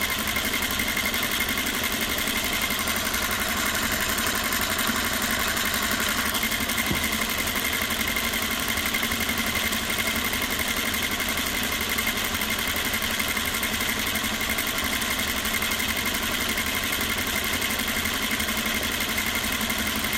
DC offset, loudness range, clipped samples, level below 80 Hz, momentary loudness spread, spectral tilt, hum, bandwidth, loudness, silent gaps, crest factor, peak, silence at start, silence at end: under 0.1%; 1 LU; under 0.1%; -42 dBFS; 1 LU; -1.5 dB/octave; none; 16.5 kHz; -24 LUFS; none; 16 dB; -10 dBFS; 0 s; 0 s